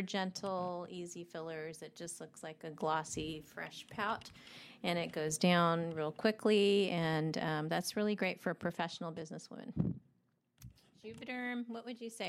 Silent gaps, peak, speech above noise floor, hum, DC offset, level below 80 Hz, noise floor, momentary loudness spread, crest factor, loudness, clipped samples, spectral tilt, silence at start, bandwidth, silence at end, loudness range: none; -16 dBFS; 39 dB; none; under 0.1%; -70 dBFS; -76 dBFS; 17 LU; 22 dB; -37 LUFS; under 0.1%; -5 dB/octave; 0 s; 15.5 kHz; 0 s; 10 LU